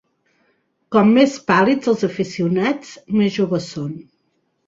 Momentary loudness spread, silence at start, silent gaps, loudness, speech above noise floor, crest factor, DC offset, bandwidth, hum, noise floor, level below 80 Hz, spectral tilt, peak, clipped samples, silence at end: 14 LU; 0.9 s; none; -18 LUFS; 50 dB; 18 dB; under 0.1%; 7.8 kHz; none; -68 dBFS; -60 dBFS; -6.5 dB/octave; -2 dBFS; under 0.1%; 0.65 s